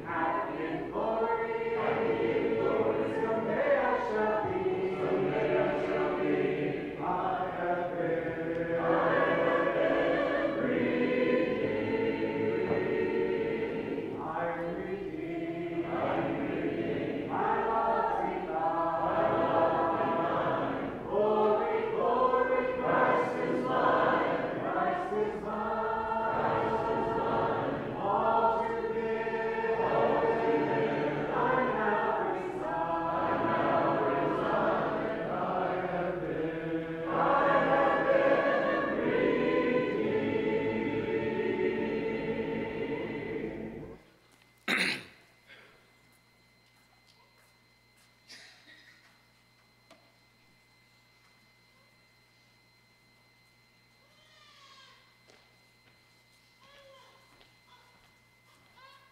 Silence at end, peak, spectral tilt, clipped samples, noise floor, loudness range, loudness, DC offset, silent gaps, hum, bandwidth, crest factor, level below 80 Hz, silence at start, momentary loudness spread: 0.25 s; -14 dBFS; -7 dB/octave; under 0.1%; -64 dBFS; 6 LU; -30 LUFS; under 0.1%; none; 60 Hz at -65 dBFS; 12.5 kHz; 18 dB; -60 dBFS; 0 s; 8 LU